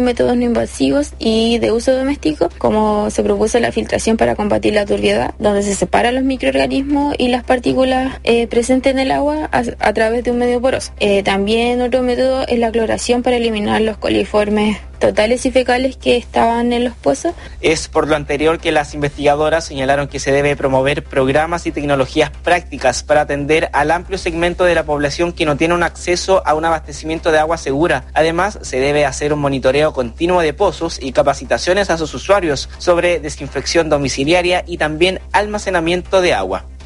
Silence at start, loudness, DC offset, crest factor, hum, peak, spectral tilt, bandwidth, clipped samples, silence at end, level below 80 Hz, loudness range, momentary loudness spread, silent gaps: 0 s; -15 LUFS; under 0.1%; 14 dB; none; 0 dBFS; -4.5 dB/octave; 11.5 kHz; under 0.1%; 0 s; -32 dBFS; 1 LU; 4 LU; none